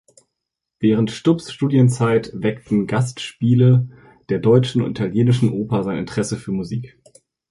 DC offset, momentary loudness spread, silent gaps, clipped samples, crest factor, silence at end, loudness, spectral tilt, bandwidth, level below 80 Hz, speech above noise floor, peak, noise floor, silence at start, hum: under 0.1%; 10 LU; none; under 0.1%; 16 dB; 0.65 s; -19 LUFS; -7.5 dB/octave; 11.5 kHz; -52 dBFS; 63 dB; -2 dBFS; -81 dBFS; 0.8 s; none